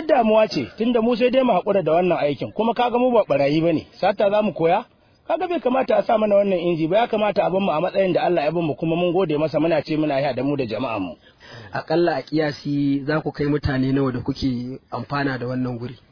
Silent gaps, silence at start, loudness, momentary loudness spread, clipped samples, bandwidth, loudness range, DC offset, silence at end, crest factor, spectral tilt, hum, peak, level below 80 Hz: none; 0 s; -21 LUFS; 7 LU; under 0.1%; 5.4 kHz; 4 LU; under 0.1%; 0.15 s; 14 dB; -8 dB/octave; none; -6 dBFS; -48 dBFS